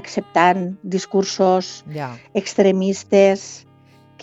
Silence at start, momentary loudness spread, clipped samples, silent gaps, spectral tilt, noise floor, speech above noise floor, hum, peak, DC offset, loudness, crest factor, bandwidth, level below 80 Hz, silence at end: 0.05 s; 15 LU; under 0.1%; none; -5 dB/octave; -50 dBFS; 32 dB; none; -2 dBFS; under 0.1%; -18 LUFS; 18 dB; 8 kHz; -66 dBFS; 0 s